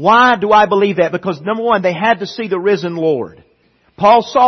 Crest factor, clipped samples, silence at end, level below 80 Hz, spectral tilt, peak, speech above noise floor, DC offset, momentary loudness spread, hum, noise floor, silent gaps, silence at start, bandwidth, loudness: 14 dB; under 0.1%; 0 s; -54 dBFS; -5.5 dB/octave; 0 dBFS; 43 dB; under 0.1%; 10 LU; none; -56 dBFS; none; 0 s; 6.4 kHz; -14 LUFS